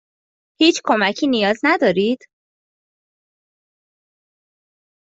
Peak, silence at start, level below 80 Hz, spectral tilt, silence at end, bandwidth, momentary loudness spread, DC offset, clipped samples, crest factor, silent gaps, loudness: -2 dBFS; 0.6 s; -66 dBFS; -4 dB/octave; 2.95 s; 8 kHz; 5 LU; under 0.1%; under 0.1%; 20 dB; none; -17 LUFS